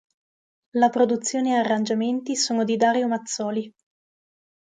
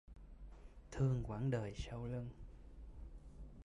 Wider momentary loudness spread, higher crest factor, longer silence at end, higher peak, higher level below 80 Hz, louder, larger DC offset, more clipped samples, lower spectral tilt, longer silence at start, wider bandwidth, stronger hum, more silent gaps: second, 8 LU vs 21 LU; about the same, 18 dB vs 16 dB; first, 0.95 s vs 0.05 s; first, -6 dBFS vs -28 dBFS; second, -74 dBFS vs -54 dBFS; first, -23 LUFS vs -42 LUFS; neither; neither; second, -3.5 dB/octave vs -7.5 dB/octave; first, 0.75 s vs 0.1 s; about the same, 9.6 kHz vs 10.5 kHz; neither; neither